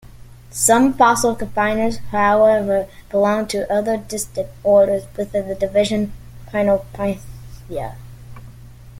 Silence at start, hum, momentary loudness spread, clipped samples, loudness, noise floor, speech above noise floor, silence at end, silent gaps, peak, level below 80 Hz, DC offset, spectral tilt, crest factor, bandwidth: 0.05 s; none; 15 LU; under 0.1%; -18 LUFS; -39 dBFS; 22 dB; 0 s; none; 0 dBFS; -42 dBFS; under 0.1%; -4.5 dB/octave; 18 dB; 16.5 kHz